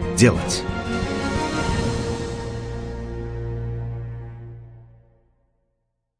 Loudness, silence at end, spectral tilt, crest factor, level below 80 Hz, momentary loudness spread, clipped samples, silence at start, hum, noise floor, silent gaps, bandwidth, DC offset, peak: -25 LUFS; 1.35 s; -5 dB/octave; 22 dB; -36 dBFS; 18 LU; under 0.1%; 0 s; none; -74 dBFS; none; 10.5 kHz; under 0.1%; -2 dBFS